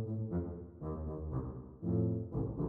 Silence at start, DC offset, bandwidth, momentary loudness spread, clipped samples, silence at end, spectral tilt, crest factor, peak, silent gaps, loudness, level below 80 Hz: 0 s; under 0.1%; 2 kHz; 10 LU; under 0.1%; 0 s; -13.5 dB/octave; 14 dB; -24 dBFS; none; -39 LUFS; -50 dBFS